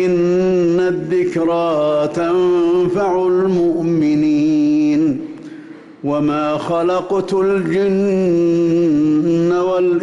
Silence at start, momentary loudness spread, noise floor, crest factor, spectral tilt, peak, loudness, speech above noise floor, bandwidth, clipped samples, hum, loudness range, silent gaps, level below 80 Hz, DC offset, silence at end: 0 s; 4 LU; -36 dBFS; 6 dB; -8 dB/octave; -8 dBFS; -16 LUFS; 21 dB; 7.8 kHz; under 0.1%; none; 3 LU; none; -52 dBFS; under 0.1%; 0 s